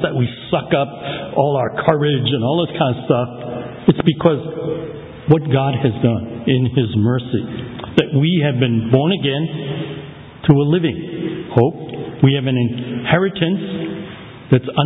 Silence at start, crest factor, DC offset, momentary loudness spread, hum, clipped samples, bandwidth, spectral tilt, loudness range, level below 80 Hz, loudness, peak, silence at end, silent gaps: 0 s; 18 dB; under 0.1%; 12 LU; none; under 0.1%; 4 kHz; -9.5 dB/octave; 1 LU; -46 dBFS; -18 LUFS; 0 dBFS; 0 s; none